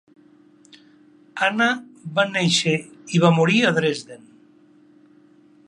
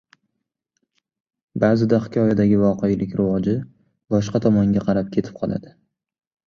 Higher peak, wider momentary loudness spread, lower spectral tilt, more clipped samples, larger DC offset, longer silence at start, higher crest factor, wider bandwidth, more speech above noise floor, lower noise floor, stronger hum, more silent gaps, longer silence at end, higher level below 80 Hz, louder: about the same, -2 dBFS vs -2 dBFS; about the same, 12 LU vs 10 LU; second, -4.5 dB/octave vs -8.5 dB/octave; neither; neither; second, 1.35 s vs 1.55 s; about the same, 22 dB vs 18 dB; first, 11 kHz vs 7 kHz; second, 33 dB vs 60 dB; second, -53 dBFS vs -79 dBFS; neither; neither; first, 1.5 s vs 0.75 s; second, -70 dBFS vs -50 dBFS; about the same, -20 LUFS vs -20 LUFS